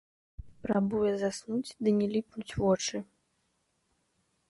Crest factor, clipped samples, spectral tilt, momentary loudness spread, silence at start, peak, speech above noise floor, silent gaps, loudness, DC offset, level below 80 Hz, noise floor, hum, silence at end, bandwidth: 18 dB; under 0.1%; -5.5 dB/octave; 9 LU; 0.4 s; -16 dBFS; 46 dB; none; -31 LUFS; under 0.1%; -56 dBFS; -76 dBFS; none; 1.45 s; 11.5 kHz